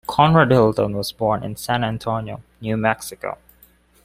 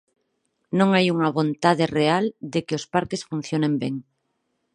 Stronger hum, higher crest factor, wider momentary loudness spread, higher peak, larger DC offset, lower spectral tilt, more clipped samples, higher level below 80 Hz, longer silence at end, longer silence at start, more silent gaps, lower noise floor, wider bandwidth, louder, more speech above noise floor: neither; about the same, 18 dB vs 20 dB; first, 17 LU vs 10 LU; about the same, -2 dBFS vs -4 dBFS; neither; about the same, -6 dB/octave vs -6 dB/octave; neither; first, -48 dBFS vs -62 dBFS; about the same, 0.7 s vs 0.75 s; second, 0.1 s vs 0.7 s; neither; second, -54 dBFS vs -74 dBFS; first, 16 kHz vs 10.5 kHz; first, -19 LUFS vs -22 LUFS; second, 35 dB vs 52 dB